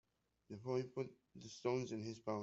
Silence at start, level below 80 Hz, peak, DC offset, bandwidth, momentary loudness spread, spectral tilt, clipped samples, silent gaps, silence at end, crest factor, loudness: 0.5 s; -82 dBFS; -26 dBFS; under 0.1%; 8 kHz; 14 LU; -6 dB/octave; under 0.1%; none; 0 s; 20 dB; -45 LUFS